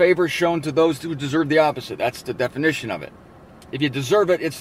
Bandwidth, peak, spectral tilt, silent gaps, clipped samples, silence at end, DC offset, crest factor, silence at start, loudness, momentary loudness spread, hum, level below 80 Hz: 16 kHz; -4 dBFS; -5.5 dB/octave; none; under 0.1%; 0 s; under 0.1%; 16 dB; 0 s; -21 LUFS; 9 LU; none; -56 dBFS